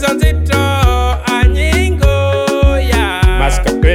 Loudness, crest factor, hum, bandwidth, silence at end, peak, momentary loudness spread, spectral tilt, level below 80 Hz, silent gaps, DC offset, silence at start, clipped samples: -12 LUFS; 10 dB; none; 15.5 kHz; 0 s; 0 dBFS; 2 LU; -5.5 dB/octave; -14 dBFS; none; under 0.1%; 0 s; under 0.1%